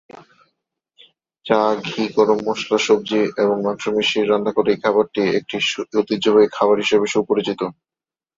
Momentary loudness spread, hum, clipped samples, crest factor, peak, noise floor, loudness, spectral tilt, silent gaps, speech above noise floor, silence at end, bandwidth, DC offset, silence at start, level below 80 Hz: 6 LU; none; under 0.1%; 18 dB; -2 dBFS; -74 dBFS; -18 LUFS; -4.5 dB/octave; none; 56 dB; 0.65 s; 7.8 kHz; under 0.1%; 0.15 s; -62 dBFS